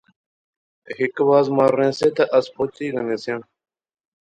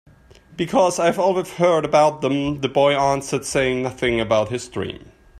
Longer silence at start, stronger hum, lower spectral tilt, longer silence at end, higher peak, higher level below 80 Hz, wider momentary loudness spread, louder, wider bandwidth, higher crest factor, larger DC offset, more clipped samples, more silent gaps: first, 0.9 s vs 0.5 s; neither; first, -6.5 dB/octave vs -5 dB/octave; first, 0.9 s vs 0 s; about the same, -4 dBFS vs -4 dBFS; second, -64 dBFS vs -48 dBFS; about the same, 11 LU vs 11 LU; about the same, -20 LUFS vs -20 LUFS; second, 10.5 kHz vs 14 kHz; about the same, 18 dB vs 16 dB; neither; neither; neither